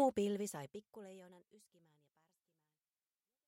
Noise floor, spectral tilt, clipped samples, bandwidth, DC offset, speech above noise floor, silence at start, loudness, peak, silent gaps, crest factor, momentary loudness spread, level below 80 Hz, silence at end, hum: under -90 dBFS; -5.5 dB/octave; under 0.1%; 16 kHz; under 0.1%; over 45 dB; 0 s; -41 LUFS; -22 dBFS; none; 22 dB; 21 LU; -80 dBFS; 2.1 s; none